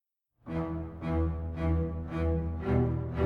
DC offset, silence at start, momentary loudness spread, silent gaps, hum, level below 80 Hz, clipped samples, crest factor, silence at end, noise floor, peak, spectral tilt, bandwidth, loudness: under 0.1%; 0.45 s; 8 LU; none; none; -38 dBFS; under 0.1%; 16 dB; 0 s; -52 dBFS; -16 dBFS; -10.5 dB/octave; 4.9 kHz; -32 LUFS